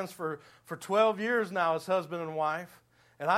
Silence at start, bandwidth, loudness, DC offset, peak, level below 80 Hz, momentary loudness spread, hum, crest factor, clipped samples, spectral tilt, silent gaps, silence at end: 0 s; 16 kHz; -30 LUFS; under 0.1%; -12 dBFS; -80 dBFS; 16 LU; none; 18 dB; under 0.1%; -5 dB/octave; none; 0 s